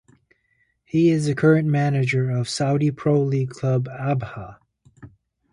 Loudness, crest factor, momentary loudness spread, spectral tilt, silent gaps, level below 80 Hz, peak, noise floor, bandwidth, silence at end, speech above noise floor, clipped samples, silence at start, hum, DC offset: -21 LUFS; 18 dB; 8 LU; -7 dB/octave; none; -56 dBFS; -4 dBFS; -67 dBFS; 11 kHz; 0.45 s; 47 dB; under 0.1%; 0.95 s; none; under 0.1%